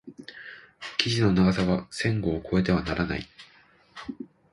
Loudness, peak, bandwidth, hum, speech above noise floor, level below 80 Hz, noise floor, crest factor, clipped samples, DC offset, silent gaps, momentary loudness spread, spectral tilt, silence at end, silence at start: -26 LUFS; 0 dBFS; 11.5 kHz; none; 27 dB; -46 dBFS; -52 dBFS; 26 dB; under 0.1%; under 0.1%; none; 21 LU; -6 dB/octave; 0.3 s; 0.05 s